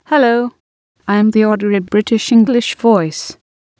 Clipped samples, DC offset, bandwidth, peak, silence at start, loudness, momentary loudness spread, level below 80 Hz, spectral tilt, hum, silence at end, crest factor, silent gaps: under 0.1%; under 0.1%; 8 kHz; 0 dBFS; 0.1 s; -13 LUFS; 13 LU; -56 dBFS; -5.5 dB/octave; none; 0.45 s; 14 dB; 0.60-0.95 s